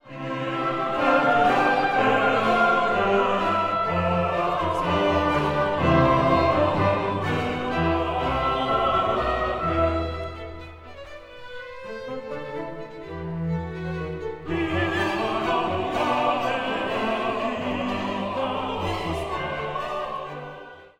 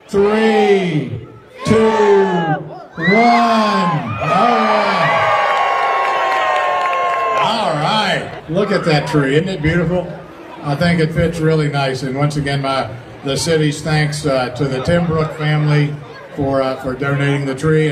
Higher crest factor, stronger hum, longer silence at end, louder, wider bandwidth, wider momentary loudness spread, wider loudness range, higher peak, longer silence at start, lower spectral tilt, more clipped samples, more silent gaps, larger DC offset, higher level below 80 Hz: about the same, 18 dB vs 16 dB; neither; about the same, 0.1 s vs 0 s; second, -24 LUFS vs -15 LUFS; about the same, 15 kHz vs 14 kHz; first, 16 LU vs 9 LU; first, 11 LU vs 4 LU; second, -6 dBFS vs 0 dBFS; about the same, 0.05 s vs 0.1 s; about the same, -6.5 dB/octave vs -6 dB/octave; neither; neither; neither; about the same, -42 dBFS vs -42 dBFS